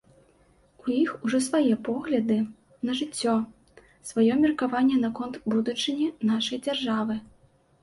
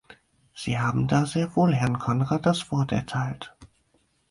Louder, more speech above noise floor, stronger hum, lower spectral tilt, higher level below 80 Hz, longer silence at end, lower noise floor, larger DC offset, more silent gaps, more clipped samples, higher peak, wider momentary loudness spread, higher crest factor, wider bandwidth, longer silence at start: about the same, -26 LUFS vs -25 LUFS; second, 36 dB vs 43 dB; neither; second, -4.5 dB/octave vs -6.5 dB/octave; second, -64 dBFS vs -54 dBFS; about the same, 0.6 s vs 0.65 s; second, -61 dBFS vs -67 dBFS; neither; neither; neither; second, -12 dBFS vs -8 dBFS; about the same, 9 LU vs 10 LU; about the same, 16 dB vs 18 dB; about the same, 11.5 kHz vs 11.5 kHz; first, 0.85 s vs 0.1 s